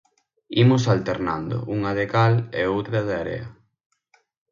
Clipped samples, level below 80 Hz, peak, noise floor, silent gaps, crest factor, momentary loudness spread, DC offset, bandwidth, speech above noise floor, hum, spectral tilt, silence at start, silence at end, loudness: under 0.1%; -50 dBFS; -6 dBFS; -64 dBFS; none; 18 dB; 10 LU; under 0.1%; 7.4 kHz; 43 dB; none; -7 dB/octave; 0.5 s; 1 s; -22 LUFS